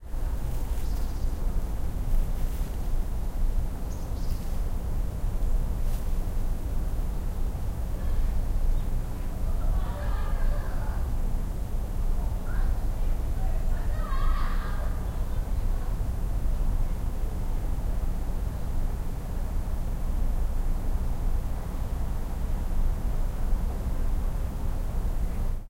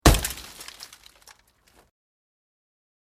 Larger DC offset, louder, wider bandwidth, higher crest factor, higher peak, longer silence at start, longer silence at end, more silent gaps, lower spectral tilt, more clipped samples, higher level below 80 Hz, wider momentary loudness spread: neither; second, -33 LUFS vs -27 LUFS; about the same, 16 kHz vs 16 kHz; second, 12 dB vs 28 dB; second, -14 dBFS vs 0 dBFS; about the same, 0 s vs 0.05 s; second, 0 s vs 2.4 s; neither; first, -7 dB/octave vs -4 dB/octave; neither; first, -26 dBFS vs -32 dBFS; second, 3 LU vs 25 LU